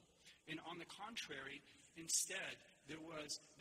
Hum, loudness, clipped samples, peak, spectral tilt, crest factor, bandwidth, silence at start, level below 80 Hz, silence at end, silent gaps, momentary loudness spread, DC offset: none; -47 LUFS; under 0.1%; -26 dBFS; -1 dB/octave; 24 dB; 15.5 kHz; 0 s; -84 dBFS; 0 s; none; 18 LU; under 0.1%